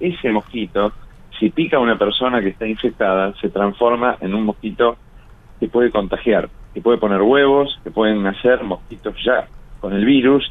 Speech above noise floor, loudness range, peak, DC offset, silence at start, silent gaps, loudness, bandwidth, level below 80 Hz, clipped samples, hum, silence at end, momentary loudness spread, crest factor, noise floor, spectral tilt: 25 dB; 2 LU; -2 dBFS; under 0.1%; 0 s; none; -17 LUFS; 4 kHz; -42 dBFS; under 0.1%; none; 0 s; 10 LU; 16 dB; -42 dBFS; -8 dB/octave